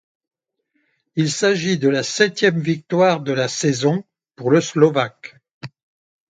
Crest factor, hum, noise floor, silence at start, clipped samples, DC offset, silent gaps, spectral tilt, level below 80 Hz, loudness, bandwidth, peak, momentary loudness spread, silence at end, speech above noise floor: 20 dB; none; -71 dBFS; 1.15 s; under 0.1%; under 0.1%; 5.53-5.61 s; -5 dB/octave; -64 dBFS; -18 LUFS; 9.4 kHz; 0 dBFS; 23 LU; 0.6 s; 53 dB